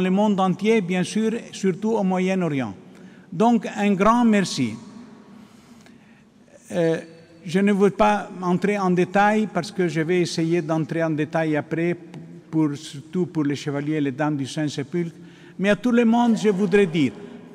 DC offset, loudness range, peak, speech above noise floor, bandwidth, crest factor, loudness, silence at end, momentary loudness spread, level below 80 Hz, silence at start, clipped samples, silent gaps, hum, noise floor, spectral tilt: under 0.1%; 4 LU; -8 dBFS; 31 dB; 12 kHz; 14 dB; -22 LUFS; 0 s; 11 LU; -56 dBFS; 0 s; under 0.1%; none; none; -52 dBFS; -6.5 dB/octave